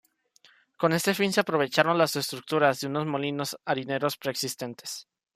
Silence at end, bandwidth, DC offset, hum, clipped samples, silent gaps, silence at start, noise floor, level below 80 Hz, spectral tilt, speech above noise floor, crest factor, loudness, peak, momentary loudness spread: 0.35 s; 15.5 kHz; under 0.1%; none; under 0.1%; none; 0.8 s; -61 dBFS; -72 dBFS; -4 dB/octave; 35 dB; 22 dB; -27 LUFS; -6 dBFS; 11 LU